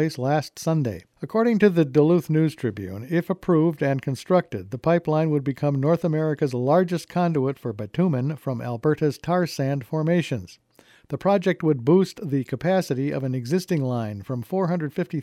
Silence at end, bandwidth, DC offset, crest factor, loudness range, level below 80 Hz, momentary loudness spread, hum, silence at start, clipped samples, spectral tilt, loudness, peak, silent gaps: 0 s; 14.5 kHz; under 0.1%; 18 dB; 3 LU; -60 dBFS; 10 LU; none; 0 s; under 0.1%; -7.5 dB/octave; -23 LUFS; -6 dBFS; none